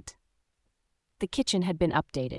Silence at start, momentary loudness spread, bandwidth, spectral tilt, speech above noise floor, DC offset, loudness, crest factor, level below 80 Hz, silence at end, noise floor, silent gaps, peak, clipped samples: 0.05 s; 10 LU; 12 kHz; -5 dB/octave; 49 dB; under 0.1%; -29 LUFS; 20 dB; -52 dBFS; 0 s; -77 dBFS; none; -12 dBFS; under 0.1%